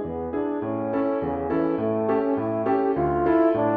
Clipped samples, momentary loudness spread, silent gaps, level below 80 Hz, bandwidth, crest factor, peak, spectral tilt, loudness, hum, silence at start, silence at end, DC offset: under 0.1%; 7 LU; none; -48 dBFS; 4.6 kHz; 14 dB; -10 dBFS; -10.5 dB/octave; -24 LUFS; none; 0 s; 0 s; under 0.1%